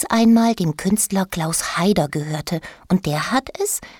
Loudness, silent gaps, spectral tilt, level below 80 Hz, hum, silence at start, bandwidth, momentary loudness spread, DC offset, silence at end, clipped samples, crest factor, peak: -19 LUFS; none; -4.5 dB/octave; -48 dBFS; none; 0 s; 19.5 kHz; 10 LU; under 0.1%; 0.1 s; under 0.1%; 16 dB; -4 dBFS